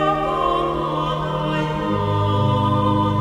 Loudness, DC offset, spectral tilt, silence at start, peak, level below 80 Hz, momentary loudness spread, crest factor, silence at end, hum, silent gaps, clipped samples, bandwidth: -20 LUFS; under 0.1%; -7.5 dB/octave; 0 s; -6 dBFS; -38 dBFS; 4 LU; 12 dB; 0 s; none; none; under 0.1%; 10.5 kHz